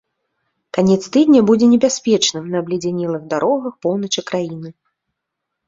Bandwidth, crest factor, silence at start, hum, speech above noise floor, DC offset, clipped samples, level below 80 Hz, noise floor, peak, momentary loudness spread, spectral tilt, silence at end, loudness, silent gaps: 7.8 kHz; 16 dB; 0.75 s; none; 63 dB; under 0.1%; under 0.1%; -60 dBFS; -79 dBFS; -2 dBFS; 11 LU; -5 dB/octave; 0.95 s; -16 LUFS; none